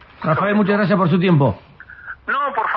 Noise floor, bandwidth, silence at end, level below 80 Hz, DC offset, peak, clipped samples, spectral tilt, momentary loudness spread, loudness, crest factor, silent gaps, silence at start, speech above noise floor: -37 dBFS; 5.2 kHz; 0 s; -52 dBFS; under 0.1%; -4 dBFS; under 0.1%; -10.5 dB/octave; 17 LU; -17 LUFS; 14 dB; none; 0.2 s; 21 dB